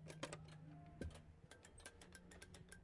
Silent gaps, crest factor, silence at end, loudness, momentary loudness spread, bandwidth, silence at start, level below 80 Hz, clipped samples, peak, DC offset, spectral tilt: none; 24 dB; 0 s; -58 LUFS; 10 LU; 11.5 kHz; 0 s; -68 dBFS; under 0.1%; -32 dBFS; under 0.1%; -4.5 dB/octave